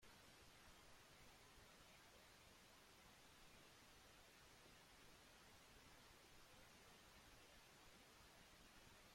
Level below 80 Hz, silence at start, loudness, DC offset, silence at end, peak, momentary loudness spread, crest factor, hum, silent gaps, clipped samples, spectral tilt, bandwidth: -78 dBFS; 0 s; -67 LUFS; under 0.1%; 0 s; -54 dBFS; 1 LU; 14 dB; none; none; under 0.1%; -2.5 dB/octave; 16.5 kHz